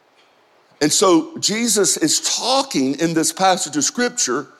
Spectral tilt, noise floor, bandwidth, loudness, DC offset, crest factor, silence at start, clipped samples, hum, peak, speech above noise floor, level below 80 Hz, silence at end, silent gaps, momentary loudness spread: -2.5 dB/octave; -55 dBFS; 16 kHz; -17 LUFS; under 0.1%; 16 dB; 0.8 s; under 0.1%; none; -2 dBFS; 37 dB; -64 dBFS; 0.15 s; none; 4 LU